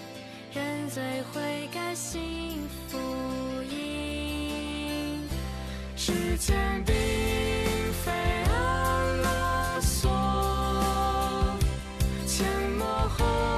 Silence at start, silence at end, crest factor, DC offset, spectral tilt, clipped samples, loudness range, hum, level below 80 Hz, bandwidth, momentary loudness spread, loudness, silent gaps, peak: 0 s; 0 s; 14 dB; under 0.1%; -4.5 dB/octave; under 0.1%; 6 LU; none; -34 dBFS; 14 kHz; 8 LU; -29 LUFS; none; -14 dBFS